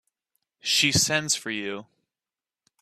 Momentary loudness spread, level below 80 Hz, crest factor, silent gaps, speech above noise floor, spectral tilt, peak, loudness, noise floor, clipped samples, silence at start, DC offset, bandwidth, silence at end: 15 LU; -60 dBFS; 22 dB; none; over 65 dB; -2 dB/octave; -6 dBFS; -23 LUFS; under -90 dBFS; under 0.1%; 0.65 s; under 0.1%; 16 kHz; 1 s